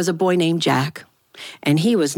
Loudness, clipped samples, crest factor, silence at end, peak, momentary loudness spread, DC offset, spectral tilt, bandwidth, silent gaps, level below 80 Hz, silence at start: -19 LUFS; under 0.1%; 16 dB; 0 s; -4 dBFS; 19 LU; under 0.1%; -5.5 dB/octave; 18 kHz; none; -68 dBFS; 0 s